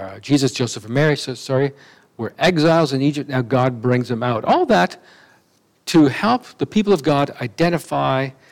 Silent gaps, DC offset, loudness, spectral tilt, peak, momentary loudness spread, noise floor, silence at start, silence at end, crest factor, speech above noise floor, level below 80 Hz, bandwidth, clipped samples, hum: none; under 0.1%; -18 LUFS; -6 dB/octave; -2 dBFS; 8 LU; -59 dBFS; 0 s; 0.2 s; 16 dB; 41 dB; -56 dBFS; 16.5 kHz; under 0.1%; none